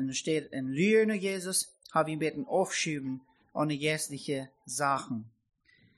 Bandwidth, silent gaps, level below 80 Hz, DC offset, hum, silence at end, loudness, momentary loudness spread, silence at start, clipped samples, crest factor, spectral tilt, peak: 13 kHz; none; -74 dBFS; under 0.1%; none; 0.7 s; -31 LUFS; 12 LU; 0 s; under 0.1%; 18 dB; -4 dB/octave; -12 dBFS